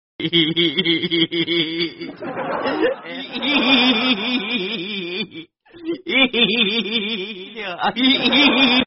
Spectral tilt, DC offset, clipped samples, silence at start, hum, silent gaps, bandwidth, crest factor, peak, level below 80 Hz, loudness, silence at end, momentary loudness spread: -1 dB/octave; under 0.1%; under 0.1%; 0.2 s; none; none; 5.8 kHz; 18 dB; -2 dBFS; -56 dBFS; -18 LUFS; 0 s; 15 LU